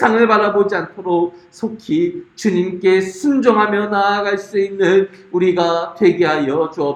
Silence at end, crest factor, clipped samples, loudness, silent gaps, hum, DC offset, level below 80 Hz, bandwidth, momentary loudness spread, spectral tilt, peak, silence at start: 0 s; 16 dB; under 0.1%; -16 LUFS; none; none; under 0.1%; -60 dBFS; 9.8 kHz; 8 LU; -6 dB/octave; 0 dBFS; 0 s